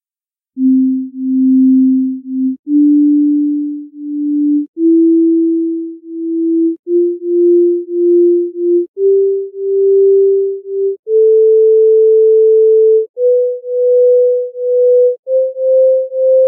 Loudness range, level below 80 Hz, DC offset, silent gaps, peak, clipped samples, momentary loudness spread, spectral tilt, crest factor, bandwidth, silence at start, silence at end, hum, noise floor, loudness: 4 LU; -82 dBFS; under 0.1%; 2.59-2.63 s, 4.68-4.74 s, 6.79-6.83 s, 8.88-8.94 s, 10.99-11.03 s, 13.09-13.14 s, 15.19-15.23 s; -4 dBFS; under 0.1%; 9 LU; -16.5 dB/octave; 6 dB; 0.7 kHz; 0.55 s; 0 s; none; under -90 dBFS; -11 LUFS